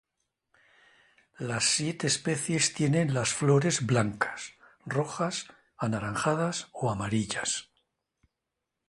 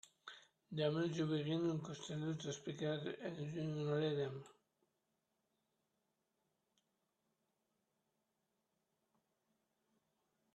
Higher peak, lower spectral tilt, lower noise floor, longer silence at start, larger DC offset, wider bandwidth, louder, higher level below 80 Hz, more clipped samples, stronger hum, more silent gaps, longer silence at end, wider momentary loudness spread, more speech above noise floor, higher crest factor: first, -10 dBFS vs -26 dBFS; second, -4 dB/octave vs -6 dB/octave; about the same, -86 dBFS vs -87 dBFS; first, 1.4 s vs 0.25 s; neither; first, 11.5 kHz vs 8.8 kHz; first, -28 LUFS vs -42 LUFS; first, -62 dBFS vs -82 dBFS; neither; neither; neither; second, 1.25 s vs 6.05 s; second, 10 LU vs 14 LU; first, 57 dB vs 46 dB; about the same, 20 dB vs 20 dB